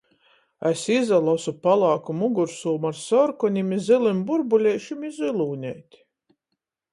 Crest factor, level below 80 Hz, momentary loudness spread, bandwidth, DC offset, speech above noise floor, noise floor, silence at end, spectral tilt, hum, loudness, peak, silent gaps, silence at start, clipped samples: 16 dB; -70 dBFS; 9 LU; 11.5 kHz; under 0.1%; 59 dB; -81 dBFS; 1.1 s; -6 dB/octave; none; -23 LUFS; -6 dBFS; none; 0.6 s; under 0.1%